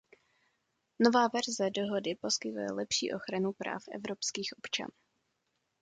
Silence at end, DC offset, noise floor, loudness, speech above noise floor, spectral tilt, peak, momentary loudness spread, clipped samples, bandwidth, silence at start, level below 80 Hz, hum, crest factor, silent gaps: 0.95 s; under 0.1%; -81 dBFS; -33 LUFS; 48 dB; -3 dB/octave; -12 dBFS; 11 LU; under 0.1%; 9.6 kHz; 1 s; -76 dBFS; none; 24 dB; none